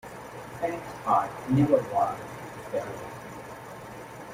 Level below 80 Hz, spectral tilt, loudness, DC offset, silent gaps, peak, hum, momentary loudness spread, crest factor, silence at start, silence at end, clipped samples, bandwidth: -60 dBFS; -7 dB/octave; -28 LUFS; under 0.1%; none; -8 dBFS; none; 18 LU; 20 dB; 0.05 s; 0 s; under 0.1%; 16 kHz